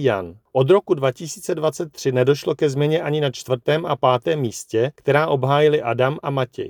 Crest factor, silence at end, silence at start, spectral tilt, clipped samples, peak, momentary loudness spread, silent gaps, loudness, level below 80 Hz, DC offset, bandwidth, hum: 18 dB; 0 s; 0 s; -6 dB/octave; under 0.1%; -2 dBFS; 7 LU; none; -20 LUFS; -64 dBFS; under 0.1%; 19.5 kHz; none